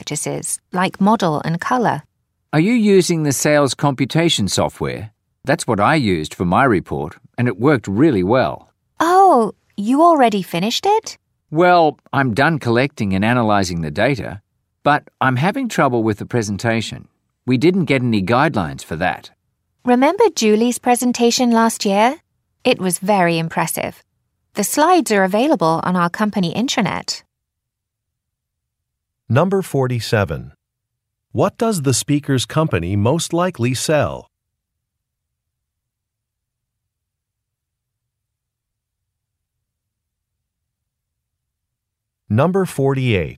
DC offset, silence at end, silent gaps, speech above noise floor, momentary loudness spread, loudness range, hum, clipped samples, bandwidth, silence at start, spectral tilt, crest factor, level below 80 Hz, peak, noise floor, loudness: under 0.1%; 0 s; none; 64 dB; 10 LU; 6 LU; none; under 0.1%; 16 kHz; 0 s; -5 dB/octave; 16 dB; -50 dBFS; -2 dBFS; -80 dBFS; -17 LUFS